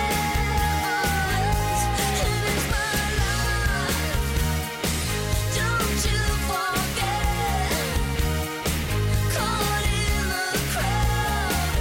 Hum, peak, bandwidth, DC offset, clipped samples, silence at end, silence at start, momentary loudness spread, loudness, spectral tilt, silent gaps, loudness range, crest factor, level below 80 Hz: none; -12 dBFS; 17 kHz; under 0.1%; under 0.1%; 0 s; 0 s; 2 LU; -24 LUFS; -4 dB/octave; none; 1 LU; 10 dB; -28 dBFS